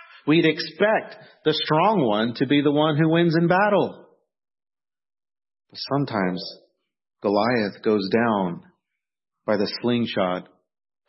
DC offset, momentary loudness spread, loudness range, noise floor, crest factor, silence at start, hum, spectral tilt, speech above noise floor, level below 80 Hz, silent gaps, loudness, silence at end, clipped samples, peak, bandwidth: under 0.1%; 11 LU; 7 LU; -82 dBFS; 18 dB; 0.25 s; none; -9.5 dB/octave; 61 dB; -68 dBFS; none; -22 LUFS; 0.65 s; under 0.1%; -6 dBFS; 6 kHz